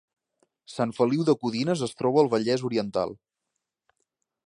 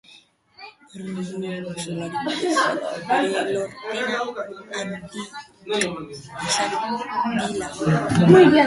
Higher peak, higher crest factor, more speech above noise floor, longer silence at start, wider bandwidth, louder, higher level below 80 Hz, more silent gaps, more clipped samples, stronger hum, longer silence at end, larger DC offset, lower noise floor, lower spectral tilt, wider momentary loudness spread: second, -8 dBFS vs 0 dBFS; about the same, 20 dB vs 22 dB; first, 59 dB vs 31 dB; about the same, 0.7 s vs 0.6 s; about the same, 11 kHz vs 11.5 kHz; second, -25 LUFS vs -22 LUFS; second, -68 dBFS vs -56 dBFS; neither; neither; neither; first, 1.3 s vs 0 s; neither; first, -83 dBFS vs -53 dBFS; first, -6.5 dB/octave vs -5 dB/octave; second, 8 LU vs 15 LU